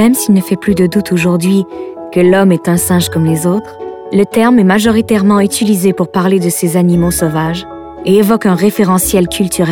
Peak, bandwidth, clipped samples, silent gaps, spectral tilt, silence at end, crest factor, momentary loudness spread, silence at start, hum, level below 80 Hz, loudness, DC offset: 0 dBFS; 18 kHz; under 0.1%; none; -5.5 dB/octave; 0 s; 10 dB; 8 LU; 0 s; none; -38 dBFS; -11 LUFS; under 0.1%